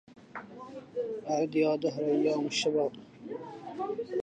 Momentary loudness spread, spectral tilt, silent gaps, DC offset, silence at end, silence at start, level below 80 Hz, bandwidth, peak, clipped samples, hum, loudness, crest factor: 18 LU; -4.5 dB/octave; none; under 0.1%; 0 s; 0.1 s; -76 dBFS; 9.4 kHz; -16 dBFS; under 0.1%; none; -31 LUFS; 16 dB